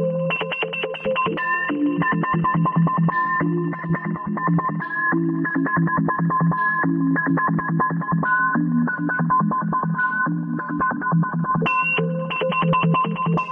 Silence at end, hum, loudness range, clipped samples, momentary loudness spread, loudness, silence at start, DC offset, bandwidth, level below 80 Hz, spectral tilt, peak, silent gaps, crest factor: 0 s; none; 1 LU; under 0.1%; 5 LU; -21 LUFS; 0 s; under 0.1%; 3.6 kHz; -56 dBFS; -9.5 dB/octave; -10 dBFS; none; 12 dB